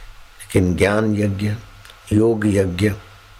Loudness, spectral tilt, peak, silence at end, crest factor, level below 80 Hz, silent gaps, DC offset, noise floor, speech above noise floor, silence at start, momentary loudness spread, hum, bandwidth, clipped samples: -19 LUFS; -7 dB/octave; -4 dBFS; 0.35 s; 14 dB; -42 dBFS; none; under 0.1%; -39 dBFS; 22 dB; 0 s; 8 LU; none; 15.5 kHz; under 0.1%